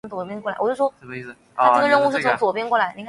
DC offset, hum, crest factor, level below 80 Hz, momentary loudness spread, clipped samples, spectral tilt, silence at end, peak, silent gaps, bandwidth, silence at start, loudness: under 0.1%; none; 18 dB; -66 dBFS; 18 LU; under 0.1%; -5 dB/octave; 0 s; -4 dBFS; none; 11.5 kHz; 0.05 s; -20 LUFS